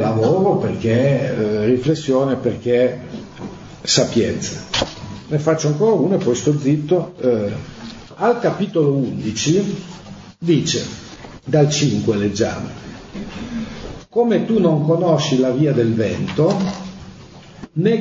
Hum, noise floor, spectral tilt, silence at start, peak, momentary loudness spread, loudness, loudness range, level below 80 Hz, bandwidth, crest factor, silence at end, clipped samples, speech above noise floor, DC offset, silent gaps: none; -40 dBFS; -5.5 dB/octave; 0 s; -2 dBFS; 18 LU; -18 LUFS; 3 LU; -48 dBFS; 8 kHz; 16 dB; 0 s; under 0.1%; 23 dB; under 0.1%; none